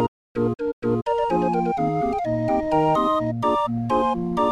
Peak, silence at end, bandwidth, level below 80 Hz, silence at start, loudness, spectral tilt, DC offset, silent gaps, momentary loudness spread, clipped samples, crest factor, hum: -8 dBFS; 0 s; 11.5 kHz; -46 dBFS; 0 s; -22 LUFS; -8 dB/octave; under 0.1%; 0.08-0.35 s, 0.73-0.82 s; 5 LU; under 0.1%; 14 dB; none